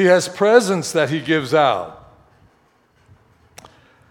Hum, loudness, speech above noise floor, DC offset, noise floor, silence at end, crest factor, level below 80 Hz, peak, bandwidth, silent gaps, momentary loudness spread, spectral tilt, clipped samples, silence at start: none; -17 LUFS; 42 dB; under 0.1%; -58 dBFS; 2.15 s; 18 dB; -62 dBFS; 0 dBFS; 17 kHz; none; 7 LU; -4.5 dB/octave; under 0.1%; 0 s